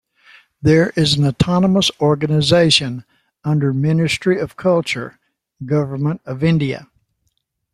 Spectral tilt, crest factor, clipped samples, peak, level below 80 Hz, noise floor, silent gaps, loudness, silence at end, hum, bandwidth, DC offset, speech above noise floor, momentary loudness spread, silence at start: -5.5 dB/octave; 18 dB; under 0.1%; 0 dBFS; -46 dBFS; -69 dBFS; none; -16 LUFS; 0.9 s; none; 12.5 kHz; under 0.1%; 53 dB; 11 LU; 0.65 s